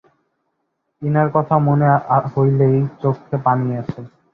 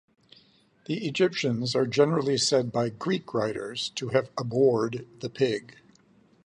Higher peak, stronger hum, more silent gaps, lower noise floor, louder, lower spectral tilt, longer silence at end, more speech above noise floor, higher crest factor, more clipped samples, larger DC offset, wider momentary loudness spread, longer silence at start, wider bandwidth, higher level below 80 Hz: first, -2 dBFS vs -8 dBFS; neither; neither; first, -72 dBFS vs -61 dBFS; first, -17 LUFS vs -27 LUFS; first, -11.5 dB/octave vs -5 dB/octave; second, 0.25 s vs 0.85 s; first, 56 dB vs 34 dB; about the same, 16 dB vs 18 dB; neither; neither; about the same, 11 LU vs 9 LU; about the same, 1 s vs 0.9 s; second, 3.5 kHz vs 10.5 kHz; first, -52 dBFS vs -66 dBFS